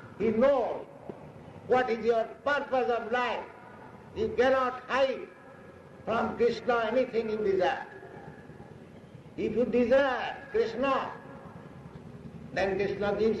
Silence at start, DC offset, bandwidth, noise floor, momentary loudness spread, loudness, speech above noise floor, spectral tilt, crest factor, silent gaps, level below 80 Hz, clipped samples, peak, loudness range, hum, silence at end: 0 s; under 0.1%; 8.4 kHz; -50 dBFS; 23 LU; -29 LUFS; 22 dB; -6 dB/octave; 14 dB; none; -58 dBFS; under 0.1%; -16 dBFS; 2 LU; none; 0 s